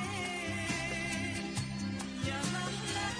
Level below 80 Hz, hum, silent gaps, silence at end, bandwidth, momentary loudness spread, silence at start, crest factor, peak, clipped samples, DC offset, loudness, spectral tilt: -54 dBFS; none; none; 0 s; 10.5 kHz; 3 LU; 0 s; 14 dB; -22 dBFS; under 0.1%; under 0.1%; -36 LUFS; -4 dB/octave